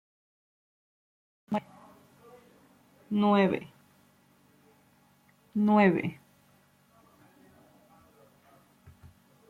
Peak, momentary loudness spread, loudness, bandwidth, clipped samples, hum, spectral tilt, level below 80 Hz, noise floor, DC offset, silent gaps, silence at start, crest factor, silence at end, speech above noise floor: -10 dBFS; 14 LU; -27 LUFS; 4.5 kHz; under 0.1%; none; -8 dB/octave; -74 dBFS; -64 dBFS; under 0.1%; none; 1.5 s; 22 dB; 3.35 s; 39 dB